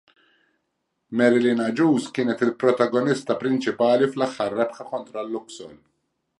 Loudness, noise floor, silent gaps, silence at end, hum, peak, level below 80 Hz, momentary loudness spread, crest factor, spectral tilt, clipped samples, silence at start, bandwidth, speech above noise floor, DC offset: -22 LUFS; -76 dBFS; none; 0.65 s; none; -4 dBFS; -72 dBFS; 12 LU; 18 dB; -6 dB/octave; under 0.1%; 1.1 s; 11 kHz; 54 dB; under 0.1%